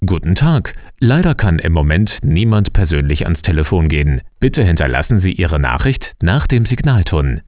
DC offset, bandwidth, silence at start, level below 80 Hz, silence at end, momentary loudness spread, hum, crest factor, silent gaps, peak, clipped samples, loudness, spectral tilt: under 0.1%; 4 kHz; 0 s; -20 dBFS; 0.05 s; 4 LU; none; 12 dB; none; 0 dBFS; under 0.1%; -15 LUFS; -11.5 dB/octave